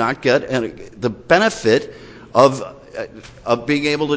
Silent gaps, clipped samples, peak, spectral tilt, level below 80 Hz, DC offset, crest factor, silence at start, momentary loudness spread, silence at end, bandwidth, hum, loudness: none; under 0.1%; 0 dBFS; -5 dB/octave; -50 dBFS; under 0.1%; 18 dB; 0 s; 17 LU; 0 s; 8 kHz; none; -17 LUFS